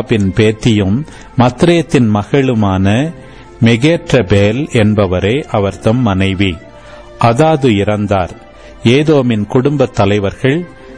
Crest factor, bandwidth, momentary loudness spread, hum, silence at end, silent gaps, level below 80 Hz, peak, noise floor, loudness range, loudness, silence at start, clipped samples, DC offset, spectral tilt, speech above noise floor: 10 dB; 10.5 kHz; 6 LU; none; 0 s; none; -36 dBFS; 0 dBFS; -34 dBFS; 1 LU; -12 LUFS; 0 s; under 0.1%; 0.7%; -7 dB/octave; 23 dB